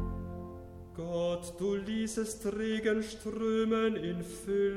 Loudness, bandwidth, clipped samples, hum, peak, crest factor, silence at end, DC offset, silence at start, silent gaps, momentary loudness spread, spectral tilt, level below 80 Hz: -34 LUFS; 16 kHz; under 0.1%; none; -18 dBFS; 16 dB; 0 s; under 0.1%; 0 s; none; 13 LU; -5.5 dB/octave; -50 dBFS